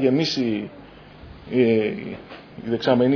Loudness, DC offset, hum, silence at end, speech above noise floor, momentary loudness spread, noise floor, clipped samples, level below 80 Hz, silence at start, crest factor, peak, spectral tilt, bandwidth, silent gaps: -22 LUFS; under 0.1%; none; 0 s; 22 dB; 22 LU; -43 dBFS; under 0.1%; -54 dBFS; 0 s; 18 dB; -4 dBFS; -6.5 dB/octave; 5.4 kHz; none